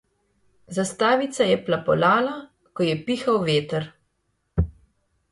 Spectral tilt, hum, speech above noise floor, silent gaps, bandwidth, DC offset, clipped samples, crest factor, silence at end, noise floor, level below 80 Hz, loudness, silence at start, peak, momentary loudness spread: -5.5 dB/octave; none; 51 dB; none; 11.5 kHz; under 0.1%; under 0.1%; 18 dB; 0.6 s; -72 dBFS; -40 dBFS; -23 LUFS; 0.7 s; -6 dBFS; 11 LU